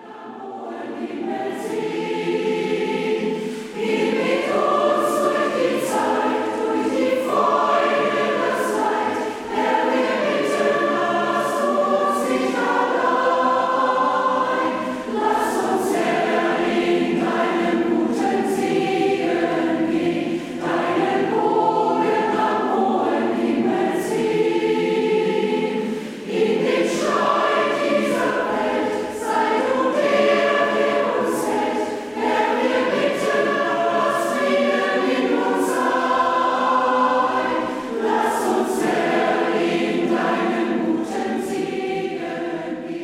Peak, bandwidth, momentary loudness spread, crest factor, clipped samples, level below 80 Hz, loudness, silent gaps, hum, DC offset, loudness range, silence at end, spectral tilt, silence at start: -6 dBFS; 16 kHz; 7 LU; 14 dB; under 0.1%; -62 dBFS; -20 LUFS; none; none; under 0.1%; 2 LU; 0 s; -4.5 dB/octave; 0 s